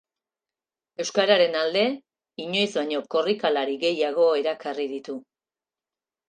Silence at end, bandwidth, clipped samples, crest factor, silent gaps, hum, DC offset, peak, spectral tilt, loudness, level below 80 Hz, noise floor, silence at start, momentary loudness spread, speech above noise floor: 1.1 s; 9.4 kHz; under 0.1%; 20 dB; none; none; under 0.1%; -6 dBFS; -3.5 dB/octave; -24 LUFS; -80 dBFS; under -90 dBFS; 1 s; 17 LU; over 66 dB